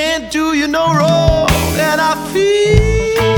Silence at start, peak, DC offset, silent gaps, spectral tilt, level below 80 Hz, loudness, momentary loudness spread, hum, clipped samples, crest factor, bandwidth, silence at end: 0 s; 0 dBFS; under 0.1%; none; -5 dB/octave; -22 dBFS; -13 LUFS; 4 LU; none; under 0.1%; 12 dB; over 20 kHz; 0 s